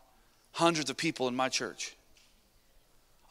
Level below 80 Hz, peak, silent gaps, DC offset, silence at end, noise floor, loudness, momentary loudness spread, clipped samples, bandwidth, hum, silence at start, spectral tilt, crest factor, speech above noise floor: -68 dBFS; -10 dBFS; none; under 0.1%; 1.4 s; -65 dBFS; -32 LUFS; 13 LU; under 0.1%; 15.5 kHz; none; 0.55 s; -3 dB/octave; 24 dB; 33 dB